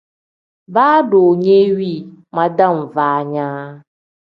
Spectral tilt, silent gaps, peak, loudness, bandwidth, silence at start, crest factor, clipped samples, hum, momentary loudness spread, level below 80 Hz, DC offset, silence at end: -9 dB/octave; none; 0 dBFS; -14 LUFS; 5.4 kHz; 0.7 s; 16 dB; under 0.1%; none; 14 LU; -64 dBFS; under 0.1%; 0.45 s